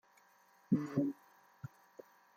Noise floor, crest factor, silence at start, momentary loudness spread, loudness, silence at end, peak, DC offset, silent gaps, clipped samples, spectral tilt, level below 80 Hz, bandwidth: -68 dBFS; 22 dB; 0.7 s; 24 LU; -37 LUFS; 0.7 s; -20 dBFS; under 0.1%; none; under 0.1%; -9 dB/octave; -84 dBFS; 15.5 kHz